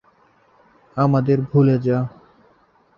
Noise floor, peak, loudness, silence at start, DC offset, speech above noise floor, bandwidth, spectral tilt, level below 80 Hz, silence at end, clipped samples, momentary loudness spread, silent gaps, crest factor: -57 dBFS; -4 dBFS; -19 LUFS; 0.95 s; under 0.1%; 40 dB; 5.8 kHz; -11 dB/octave; -56 dBFS; 0.9 s; under 0.1%; 11 LU; none; 18 dB